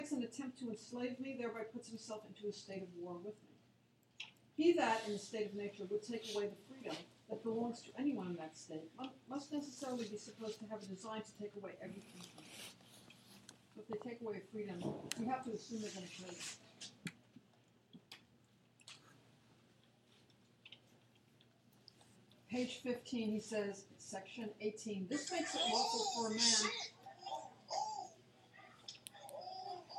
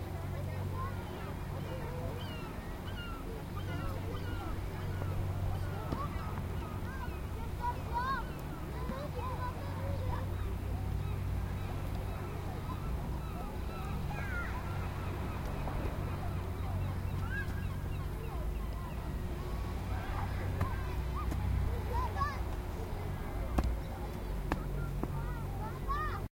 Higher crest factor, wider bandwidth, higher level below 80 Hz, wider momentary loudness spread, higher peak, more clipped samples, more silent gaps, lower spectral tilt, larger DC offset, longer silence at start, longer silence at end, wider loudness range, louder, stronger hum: about the same, 24 dB vs 24 dB; about the same, 16.5 kHz vs 16 kHz; second, -86 dBFS vs -40 dBFS; first, 22 LU vs 5 LU; second, -20 dBFS vs -14 dBFS; neither; neither; second, -3 dB/octave vs -7 dB/octave; neither; about the same, 0 s vs 0 s; about the same, 0 s vs 0.1 s; first, 17 LU vs 3 LU; second, -43 LUFS vs -39 LUFS; neither